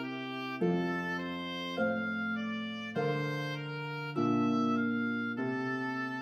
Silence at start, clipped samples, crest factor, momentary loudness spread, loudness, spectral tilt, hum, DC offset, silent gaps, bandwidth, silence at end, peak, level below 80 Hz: 0 s; under 0.1%; 14 dB; 8 LU; -34 LUFS; -7 dB/octave; none; under 0.1%; none; 13.5 kHz; 0 s; -18 dBFS; -78 dBFS